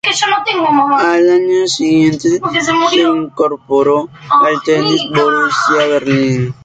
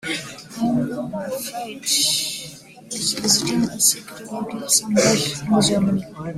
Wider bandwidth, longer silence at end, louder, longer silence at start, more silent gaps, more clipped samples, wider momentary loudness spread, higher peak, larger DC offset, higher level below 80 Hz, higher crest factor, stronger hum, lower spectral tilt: second, 9.2 kHz vs 16 kHz; about the same, 0.1 s vs 0 s; first, -12 LUFS vs -20 LUFS; about the same, 0.05 s vs 0.05 s; neither; neither; second, 4 LU vs 13 LU; about the same, 0 dBFS vs -2 dBFS; neither; about the same, -52 dBFS vs -54 dBFS; second, 12 dB vs 20 dB; neither; first, -4.5 dB/octave vs -3 dB/octave